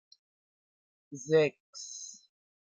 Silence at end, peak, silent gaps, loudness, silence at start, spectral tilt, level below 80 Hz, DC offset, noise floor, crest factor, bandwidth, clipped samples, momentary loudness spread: 0.65 s; -14 dBFS; 1.60-1.73 s; -30 LUFS; 1.1 s; -4.5 dB/octave; -82 dBFS; under 0.1%; under -90 dBFS; 22 dB; 8 kHz; under 0.1%; 19 LU